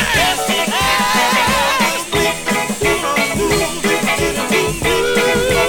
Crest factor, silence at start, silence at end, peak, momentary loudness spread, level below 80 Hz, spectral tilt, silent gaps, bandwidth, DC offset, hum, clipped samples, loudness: 12 dB; 0 s; 0 s; -2 dBFS; 3 LU; -34 dBFS; -3 dB/octave; none; 19 kHz; under 0.1%; none; under 0.1%; -15 LUFS